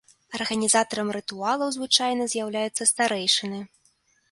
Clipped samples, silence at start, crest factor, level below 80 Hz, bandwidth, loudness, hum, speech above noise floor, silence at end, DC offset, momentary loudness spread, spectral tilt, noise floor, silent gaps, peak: under 0.1%; 0.3 s; 22 dB; -70 dBFS; 11.5 kHz; -23 LUFS; none; 40 dB; 0.65 s; under 0.1%; 9 LU; -1.5 dB/octave; -65 dBFS; none; -4 dBFS